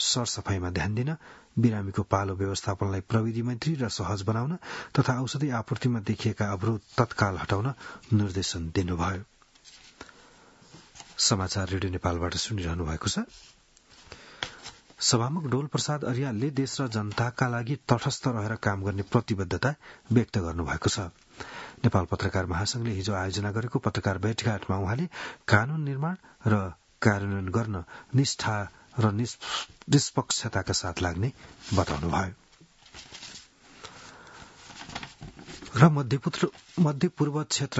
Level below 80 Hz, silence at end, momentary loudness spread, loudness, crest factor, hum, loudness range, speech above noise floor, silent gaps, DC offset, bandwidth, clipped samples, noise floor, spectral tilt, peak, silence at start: -54 dBFS; 0 s; 16 LU; -28 LUFS; 26 dB; none; 4 LU; 30 dB; none; under 0.1%; 8 kHz; under 0.1%; -57 dBFS; -5 dB/octave; -2 dBFS; 0 s